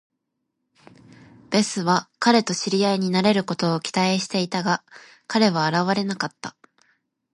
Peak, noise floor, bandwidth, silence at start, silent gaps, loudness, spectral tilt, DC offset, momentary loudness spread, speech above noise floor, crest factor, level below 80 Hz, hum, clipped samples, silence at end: -4 dBFS; -78 dBFS; 11.5 kHz; 1.5 s; none; -22 LUFS; -4.5 dB/octave; under 0.1%; 8 LU; 56 dB; 20 dB; -70 dBFS; none; under 0.1%; 0.85 s